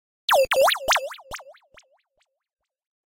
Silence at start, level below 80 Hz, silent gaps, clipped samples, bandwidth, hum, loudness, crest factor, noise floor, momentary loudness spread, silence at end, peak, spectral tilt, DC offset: 0.3 s; -56 dBFS; none; under 0.1%; 17 kHz; none; -20 LUFS; 16 dB; -73 dBFS; 20 LU; 1.55 s; -10 dBFS; 0.5 dB/octave; under 0.1%